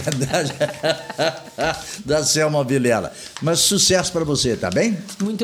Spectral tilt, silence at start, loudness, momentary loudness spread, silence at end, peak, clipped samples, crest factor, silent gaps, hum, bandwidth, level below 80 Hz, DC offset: -3.5 dB/octave; 0 s; -19 LUFS; 9 LU; 0 s; -4 dBFS; under 0.1%; 16 dB; none; none; 19 kHz; -48 dBFS; under 0.1%